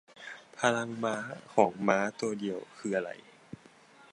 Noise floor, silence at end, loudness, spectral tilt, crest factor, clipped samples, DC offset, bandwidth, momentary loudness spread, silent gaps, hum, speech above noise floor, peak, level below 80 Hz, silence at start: -58 dBFS; 0.95 s; -31 LUFS; -4.5 dB/octave; 24 dB; under 0.1%; under 0.1%; 11.5 kHz; 22 LU; none; none; 27 dB; -8 dBFS; -76 dBFS; 0.15 s